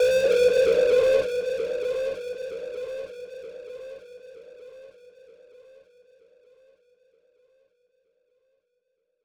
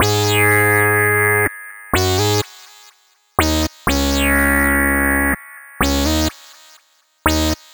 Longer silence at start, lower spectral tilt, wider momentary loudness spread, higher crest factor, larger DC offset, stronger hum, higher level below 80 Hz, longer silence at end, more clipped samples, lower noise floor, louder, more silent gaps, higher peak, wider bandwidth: about the same, 0 s vs 0 s; about the same, -3 dB/octave vs -4 dB/octave; first, 26 LU vs 8 LU; about the same, 18 dB vs 18 dB; neither; neither; second, -60 dBFS vs -28 dBFS; first, 4.4 s vs 0.2 s; neither; first, -76 dBFS vs -55 dBFS; second, -24 LUFS vs -16 LUFS; neither; second, -10 dBFS vs 0 dBFS; second, 14 kHz vs over 20 kHz